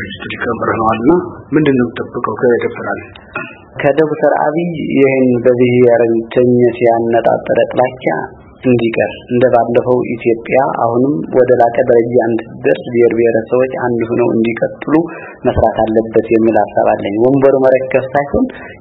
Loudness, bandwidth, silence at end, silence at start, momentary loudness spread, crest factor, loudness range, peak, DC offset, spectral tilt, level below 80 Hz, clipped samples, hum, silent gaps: -13 LUFS; 4.1 kHz; 0.05 s; 0 s; 9 LU; 12 dB; 3 LU; 0 dBFS; under 0.1%; -10 dB/octave; -42 dBFS; 0.1%; none; none